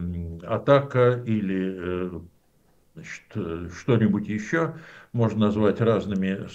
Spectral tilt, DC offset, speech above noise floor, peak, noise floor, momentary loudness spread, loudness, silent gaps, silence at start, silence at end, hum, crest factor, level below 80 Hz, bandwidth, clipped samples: -8 dB/octave; under 0.1%; 38 dB; -6 dBFS; -62 dBFS; 14 LU; -24 LUFS; none; 0 s; 0 s; none; 20 dB; -52 dBFS; 8 kHz; under 0.1%